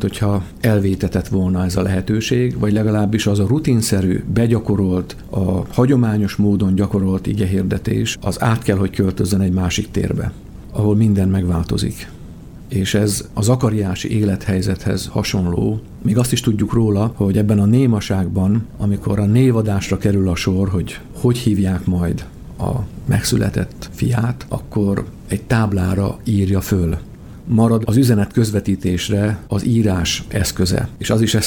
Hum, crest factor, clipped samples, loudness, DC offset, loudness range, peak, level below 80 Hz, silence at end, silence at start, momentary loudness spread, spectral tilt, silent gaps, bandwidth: none; 16 dB; under 0.1%; -18 LUFS; under 0.1%; 3 LU; -2 dBFS; -36 dBFS; 0 s; 0 s; 8 LU; -6.5 dB/octave; none; 17.5 kHz